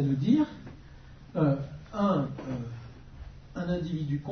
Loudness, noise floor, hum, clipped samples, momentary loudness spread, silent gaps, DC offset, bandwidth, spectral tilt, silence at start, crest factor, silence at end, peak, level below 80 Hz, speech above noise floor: -30 LUFS; -49 dBFS; none; under 0.1%; 23 LU; none; under 0.1%; 6.4 kHz; -9 dB/octave; 0 s; 18 dB; 0 s; -12 dBFS; -52 dBFS; 21 dB